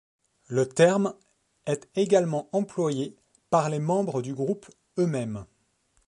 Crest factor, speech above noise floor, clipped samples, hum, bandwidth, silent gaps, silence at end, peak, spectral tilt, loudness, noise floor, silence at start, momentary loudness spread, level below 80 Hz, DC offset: 20 dB; 43 dB; under 0.1%; none; 11.5 kHz; none; 0.65 s; -6 dBFS; -6 dB/octave; -26 LUFS; -69 dBFS; 0.5 s; 14 LU; -66 dBFS; under 0.1%